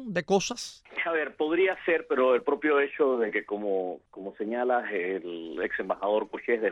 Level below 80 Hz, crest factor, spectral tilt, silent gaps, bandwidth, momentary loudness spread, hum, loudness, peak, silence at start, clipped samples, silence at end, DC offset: -68 dBFS; 16 dB; -4.5 dB/octave; none; 11 kHz; 11 LU; none; -28 LUFS; -12 dBFS; 0 s; under 0.1%; 0 s; under 0.1%